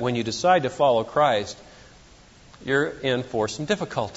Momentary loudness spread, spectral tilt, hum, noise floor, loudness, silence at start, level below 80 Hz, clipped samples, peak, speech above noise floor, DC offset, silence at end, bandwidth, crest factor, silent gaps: 7 LU; -4.5 dB/octave; none; -51 dBFS; -23 LUFS; 0 s; -56 dBFS; under 0.1%; -6 dBFS; 28 dB; under 0.1%; 0 s; 8 kHz; 18 dB; none